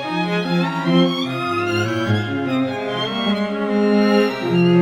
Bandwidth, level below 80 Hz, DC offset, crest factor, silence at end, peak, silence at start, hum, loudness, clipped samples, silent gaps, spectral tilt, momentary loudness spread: 13 kHz; -60 dBFS; under 0.1%; 14 dB; 0 s; -4 dBFS; 0 s; none; -19 LUFS; under 0.1%; none; -6.5 dB/octave; 6 LU